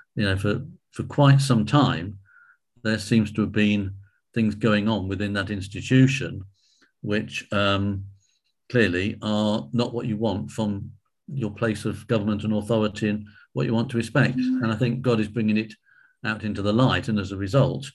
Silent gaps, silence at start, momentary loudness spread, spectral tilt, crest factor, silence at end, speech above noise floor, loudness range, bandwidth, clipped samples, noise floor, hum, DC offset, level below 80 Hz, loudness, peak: none; 0.15 s; 12 LU; -6.5 dB/octave; 20 dB; 0.05 s; 47 dB; 4 LU; 12 kHz; under 0.1%; -70 dBFS; none; under 0.1%; -48 dBFS; -24 LUFS; -4 dBFS